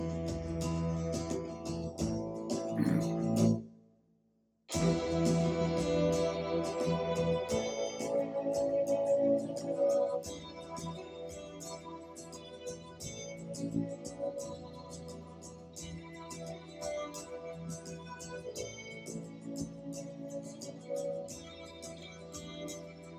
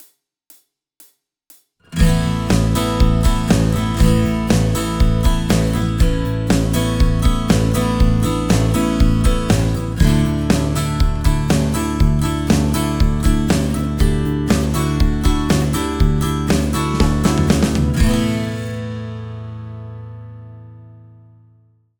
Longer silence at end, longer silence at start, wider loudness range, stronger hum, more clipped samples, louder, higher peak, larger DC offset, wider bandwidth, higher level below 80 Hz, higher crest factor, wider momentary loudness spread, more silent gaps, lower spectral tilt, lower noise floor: second, 0 s vs 1.05 s; second, 0 s vs 1.9 s; first, 11 LU vs 4 LU; neither; neither; second, -36 LUFS vs -17 LUFS; second, -16 dBFS vs 0 dBFS; neither; second, 15.5 kHz vs over 20 kHz; second, -56 dBFS vs -22 dBFS; about the same, 20 dB vs 16 dB; first, 16 LU vs 10 LU; neither; about the same, -6 dB/octave vs -6 dB/octave; first, -74 dBFS vs -54 dBFS